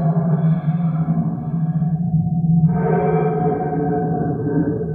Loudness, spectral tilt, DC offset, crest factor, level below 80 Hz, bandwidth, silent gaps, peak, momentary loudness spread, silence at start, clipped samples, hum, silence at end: -19 LUFS; -13.5 dB/octave; under 0.1%; 12 dB; -44 dBFS; 2.5 kHz; none; -6 dBFS; 5 LU; 0 s; under 0.1%; none; 0 s